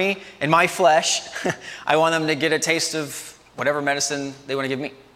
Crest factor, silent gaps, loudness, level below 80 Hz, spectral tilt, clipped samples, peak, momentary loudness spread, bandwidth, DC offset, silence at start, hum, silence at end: 18 dB; none; -21 LUFS; -64 dBFS; -3 dB/octave; under 0.1%; -2 dBFS; 12 LU; 16 kHz; under 0.1%; 0 s; none; 0.2 s